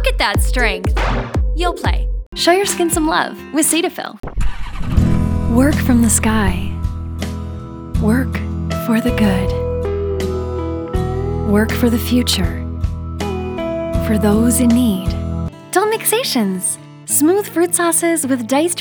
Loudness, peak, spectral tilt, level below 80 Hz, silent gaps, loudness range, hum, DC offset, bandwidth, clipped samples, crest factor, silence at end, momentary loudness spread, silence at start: -17 LUFS; 0 dBFS; -4.5 dB/octave; -24 dBFS; 2.26-2.32 s; 3 LU; none; under 0.1%; over 20 kHz; under 0.1%; 16 dB; 0 s; 11 LU; 0 s